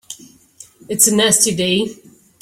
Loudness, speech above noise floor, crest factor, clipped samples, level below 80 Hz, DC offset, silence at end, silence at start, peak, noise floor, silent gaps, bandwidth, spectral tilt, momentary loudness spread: -14 LUFS; 29 dB; 18 dB; under 0.1%; -56 dBFS; under 0.1%; 0.5 s; 0.1 s; 0 dBFS; -45 dBFS; none; 16.5 kHz; -2.5 dB/octave; 20 LU